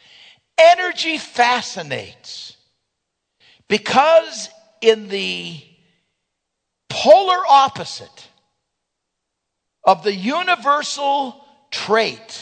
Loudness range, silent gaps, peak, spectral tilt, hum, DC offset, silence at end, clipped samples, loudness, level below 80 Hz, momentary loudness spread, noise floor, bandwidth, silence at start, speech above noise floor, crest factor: 3 LU; none; 0 dBFS; -3 dB/octave; none; under 0.1%; 0 s; under 0.1%; -16 LUFS; -68 dBFS; 18 LU; -78 dBFS; 9.4 kHz; 0.6 s; 61 dB; 18 dB